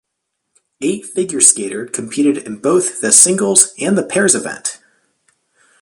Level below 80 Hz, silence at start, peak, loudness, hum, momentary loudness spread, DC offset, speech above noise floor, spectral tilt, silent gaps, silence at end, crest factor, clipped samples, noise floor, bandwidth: -60 dBFS; 0.8 s; 0 dBFS; -13 LUFS; none; 14 LU; under 0.1%; 60 dB; -2.5 dB/octave; none; 1.05 s; 16 dB; 0.2%; -74 dBFS; 16 kHz